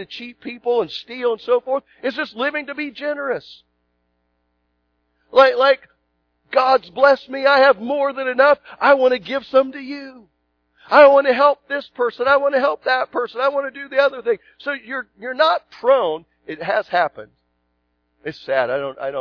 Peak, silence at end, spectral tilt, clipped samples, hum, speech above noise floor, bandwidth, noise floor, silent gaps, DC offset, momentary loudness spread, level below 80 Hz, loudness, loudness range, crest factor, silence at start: 0 dBFS; 0 s; -5 dB/octave; under 0.1%; 60 Hz at -60 dBFS; 51 dB; 5.4 kHz; -69 dBFS; none; under 0.1%; 14 LU; -64 dBFS; -18 LUFS; 8 LU; 18 dB; 0 s